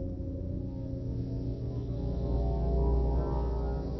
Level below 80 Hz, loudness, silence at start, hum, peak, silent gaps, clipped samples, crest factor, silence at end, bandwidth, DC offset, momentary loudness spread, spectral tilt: -34 dBFS; -33 LUFS; 0 s; none; -18 dBFS; none; under 0.1%; 14 dB; 0 s; 5.8 kHz; 0.1%; 8 LU; -10.5 dB/octave